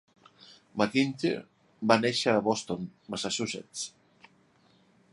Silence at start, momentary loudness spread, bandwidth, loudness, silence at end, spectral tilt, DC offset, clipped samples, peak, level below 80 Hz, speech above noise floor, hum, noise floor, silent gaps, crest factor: 0.75 s; 13 LU; 11.5 kHz; -29 LUFS; 1.25 s; -4 dB/octave; under 0.1%; under 0.1%; -6 dBFS; -70 dBFS; 35 dB; none; -64 dBFS; none; 26 dB